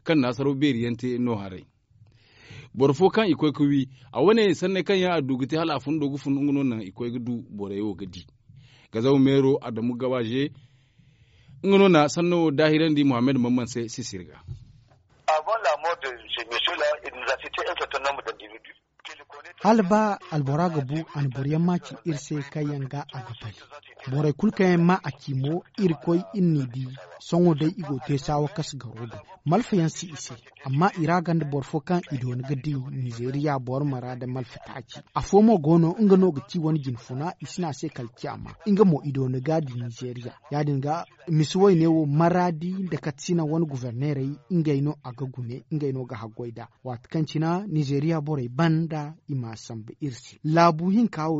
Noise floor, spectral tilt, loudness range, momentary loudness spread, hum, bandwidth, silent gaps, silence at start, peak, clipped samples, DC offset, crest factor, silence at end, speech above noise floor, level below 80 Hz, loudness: -58 dBFS; -6 dB/octave; 6 LU; 16 LU; none; 8 kHz; none; 0.05 s; -4 dBFS; under 0.1%; under 0.1%; 20 dB; 0 s; 34 dB; -58 dBFS; -25 LUFS